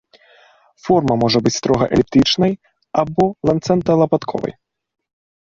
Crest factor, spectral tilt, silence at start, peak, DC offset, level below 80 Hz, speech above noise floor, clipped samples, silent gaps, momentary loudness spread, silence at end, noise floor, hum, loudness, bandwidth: 16 dB; -5.5 dB/octave; 0.85 s; -2 dBFS; under 0.1%; -46 dBFS; 35 dB; under 0.1%; none; 10 LU; 0.9 s; -51 dBFS; none; -17 LUFS; 7.6 kHz